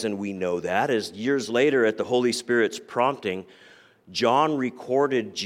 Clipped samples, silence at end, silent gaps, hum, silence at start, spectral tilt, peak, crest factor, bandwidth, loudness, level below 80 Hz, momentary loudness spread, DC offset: under 0.1%; 0 s; none; none; 0 s; -4.5 dB/octave; -8 dBFS; 16 dB; 15.5 kHz; -24 LUFS; -70 dBFS; 8 LU; under 0.1%